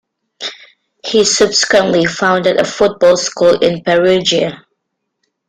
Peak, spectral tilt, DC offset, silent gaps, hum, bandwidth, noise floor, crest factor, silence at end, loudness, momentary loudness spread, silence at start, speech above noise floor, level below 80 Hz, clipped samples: 0 dBFS; -3 dB/octave; under 0.1%; none; none; 10.5 kHz; -72 dBFS; 14 dB; 0.9 s; -12 LUFS; 14 LU; 0.4 s; 61 dB; -50 dBFS; under 0.1%